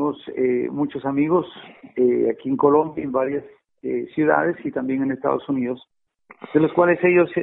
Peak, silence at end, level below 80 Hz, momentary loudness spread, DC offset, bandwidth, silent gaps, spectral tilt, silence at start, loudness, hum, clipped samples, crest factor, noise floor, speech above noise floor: -2 dBFS; 0 s; -62 dBFS; 11 LU; under 0.1%; 4 kHz; none; -11.5 dB/octave; 0 s; -21 LUFS; none; under 0.1%; 18 dB; -52 dBFS; 32 dB